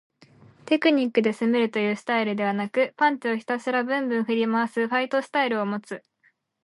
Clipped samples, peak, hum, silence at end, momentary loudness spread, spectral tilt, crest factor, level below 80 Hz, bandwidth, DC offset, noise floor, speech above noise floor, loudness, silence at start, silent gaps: under 0.1%; -8 dBFS; none; 0.65 s; 6 LU; -5.5 dB/octave; 18 dB; -78 dBFS; 11.5 kHz; under 0.1%; -66 dBFS; 42 dB; -24 LUFS; 0.65 s; none